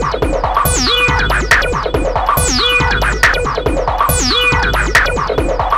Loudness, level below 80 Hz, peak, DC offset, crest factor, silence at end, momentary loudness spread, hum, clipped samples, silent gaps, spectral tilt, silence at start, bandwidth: -12 LUFS; -20 dBFS; -2 dBFS; under 0.1%; 12 dB; 0 s; 5 LU; none; under 0.1%; none; -3 dB/octave; 0 s; 16 kHz